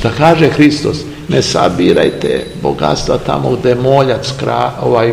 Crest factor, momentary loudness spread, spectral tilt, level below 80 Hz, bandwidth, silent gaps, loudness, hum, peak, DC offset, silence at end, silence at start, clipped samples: 12 dB; 8 LU; -6 dB/octave; -34 dBFS; 15.5 kHz; none; -12 LUFS; none; 0 dBFS; 0.5%; 0 s; 0 s; 1%